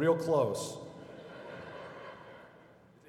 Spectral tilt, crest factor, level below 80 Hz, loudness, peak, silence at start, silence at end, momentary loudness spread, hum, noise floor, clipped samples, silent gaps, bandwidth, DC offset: -5.5 dB/octave; 20 dB; -74 dBFS; -34 LUFS; -16 dBFS; 0 s; 0.4 s; 23 LU; none; -59 dBFS; under 0.1%; none; 15 kHz; under 0.1%